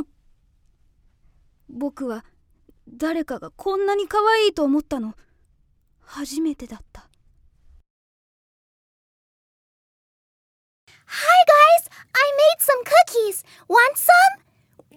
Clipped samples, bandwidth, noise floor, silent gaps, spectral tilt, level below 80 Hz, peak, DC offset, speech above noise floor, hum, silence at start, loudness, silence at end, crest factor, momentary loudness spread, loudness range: under 0.1%; 18.5 kHz; -62 dBFS; 7.90-10.87 s; -1.5 dB/octave; -56 dBFS; -2 dBFS; under 0.1%; 42 dB; none; 0 s; -18 LUFS; 0.6 s; 20 dB; 20 LU; 18 LU